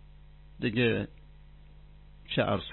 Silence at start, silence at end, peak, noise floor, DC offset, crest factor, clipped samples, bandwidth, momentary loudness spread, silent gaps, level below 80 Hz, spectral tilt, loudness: 0.55 s; 0 s; -14 dBFS; -52 dBFS; under 0.1%; 20 dB; under 0.1%; 4.3 kHz; 8 LU; none; -52 dBFS; -10 dB/octave; -30 LUFS